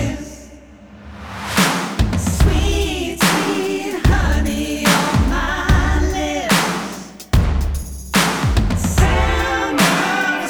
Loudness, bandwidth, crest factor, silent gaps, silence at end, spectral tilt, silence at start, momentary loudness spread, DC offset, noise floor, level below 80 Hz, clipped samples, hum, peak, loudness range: -17 LUFS; over 20 kHz; 16 dB; none; 0 s; -4.5 dB/octave; 0 s; 11 LU; under 0.1%; -40 dBFS; -22 dBFS; under 0.1%; none; -2 dBFS; 2 LU